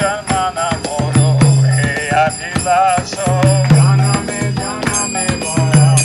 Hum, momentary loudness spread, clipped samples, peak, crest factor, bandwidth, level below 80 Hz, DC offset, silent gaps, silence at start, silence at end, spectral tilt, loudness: none; 8 LU; under 0.1%; 0 dBFS; 12 dB; 12 kHz; -38 dBFS; under 0.1%; none; 0 s; 0 s; -5 dB/octave; -14 LUFS